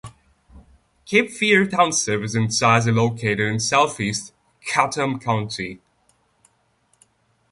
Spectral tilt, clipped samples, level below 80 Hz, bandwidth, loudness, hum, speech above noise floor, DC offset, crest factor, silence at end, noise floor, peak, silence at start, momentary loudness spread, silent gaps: -4 dB/octave; under 0.1%; -54 dBFS; 11.5 kHz; -20 LUFS; none; 44 dB; under 0.1%; 20 dB; 1.75 s; -64 dBFS; -2 dBFS; 0.05 s; 12 LU; none